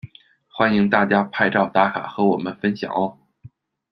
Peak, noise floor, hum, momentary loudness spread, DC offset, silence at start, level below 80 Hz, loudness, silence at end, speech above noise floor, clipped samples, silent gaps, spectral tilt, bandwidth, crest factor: -2 dBFS; -51 dBFS; none; 7 LU; under 0.1%; 0.05 s; -60 dBFS; -20 LUFS; 0.45 s; 32 dB; under 0.1%; none; -8 dB/octave; 6 kHz; 20 dB